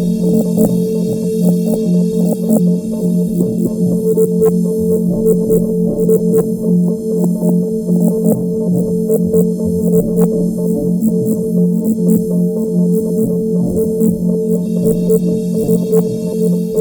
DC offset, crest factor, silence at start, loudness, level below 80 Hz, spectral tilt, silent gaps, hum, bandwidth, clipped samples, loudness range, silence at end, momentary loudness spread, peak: under 0.1%; 12 dB; 0 s; -14 LUFS; -40 dBFS; -9 dB/octave; none; none; over 20 kHz; under 0.1%; 1 LU; 0 s; 3 LU; 0 dBFS